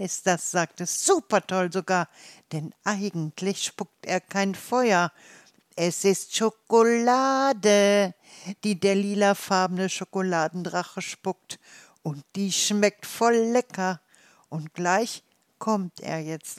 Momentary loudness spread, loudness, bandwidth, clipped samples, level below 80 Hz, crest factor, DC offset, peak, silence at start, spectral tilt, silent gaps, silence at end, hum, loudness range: 15 LU; -25 LUFS; 15.5 kHz; under 0.1%; -80 dBFS; 18 dB; under 0.1%; -6 dBFS; 0 s; -4 dB/octave; none; 0 s; none; 6 LU